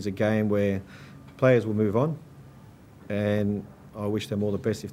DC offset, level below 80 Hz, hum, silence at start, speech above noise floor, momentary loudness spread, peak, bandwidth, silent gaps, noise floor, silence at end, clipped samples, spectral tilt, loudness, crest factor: under 0.1%; -60 dBFS; none; 0 s; 24 dB; 17 LU; -8 dBFS; 15 kHz; none; -49 dBFS; 0 s; under 0.1%; -7.5 dB/octave; -26 LUFS; 20 dB